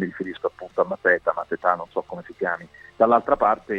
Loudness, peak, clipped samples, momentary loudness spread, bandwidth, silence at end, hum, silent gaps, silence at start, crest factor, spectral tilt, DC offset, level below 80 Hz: -23 LUFS; -4 dBFS; under 0.1%; 12 LU; 6.8 kHz; 0 s; none; none; 0 s; 20 dB; -7.5 dB/octave; under 0.1%; -56 dBFS